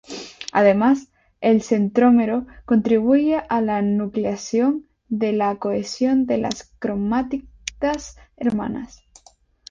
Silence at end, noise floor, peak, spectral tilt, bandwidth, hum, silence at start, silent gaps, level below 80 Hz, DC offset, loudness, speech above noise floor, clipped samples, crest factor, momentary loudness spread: 0.85 s; -55 dBFS; -4 dBFS; -6 dB/octave; 7.6 kHz; none; 0.1 s; none; -52 dBFS; under 0.1%; -20 LUFS; 35 dB; under 0.1%; 18 dB; 13 LU